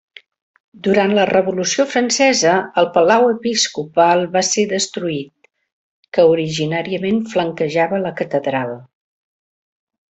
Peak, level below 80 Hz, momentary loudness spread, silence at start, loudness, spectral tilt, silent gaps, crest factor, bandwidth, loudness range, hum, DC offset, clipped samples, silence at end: 0 dBFS; -60 dBFS; 10 LU; 0.85 s; -16 LUFS; -3.5 dB/octave; 5.72-6.03 s; 16 dB; 8.4 kHz; 5 LU; none; under 0.1%; under 0.1%; 1.25 s